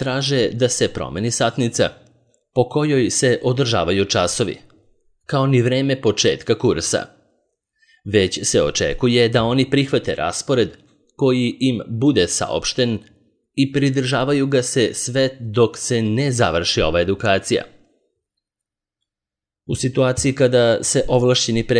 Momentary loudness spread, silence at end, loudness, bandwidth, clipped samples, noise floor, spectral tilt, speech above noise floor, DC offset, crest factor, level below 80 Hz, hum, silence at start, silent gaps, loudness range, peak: 6 LU; 0 s; -18 LUFS; 10.5 kHz; under 0.1%; -88 dBFS; -4.5 dB/octave; 70 dB; under 0.1%; 16 dB; -44 dBFS; none; 0 s; none; 2 LU; -2 dBFS